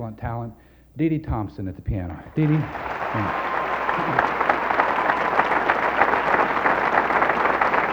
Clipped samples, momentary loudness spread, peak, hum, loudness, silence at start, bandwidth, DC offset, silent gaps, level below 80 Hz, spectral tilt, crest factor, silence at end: under 0.1%; 11 LU; 0 dBFS; none; -22 LUFS; 0 s; over 20 kHz; under 0.1%; none; -42 dBFS; -7 dB/octave; 22 dB; 0 s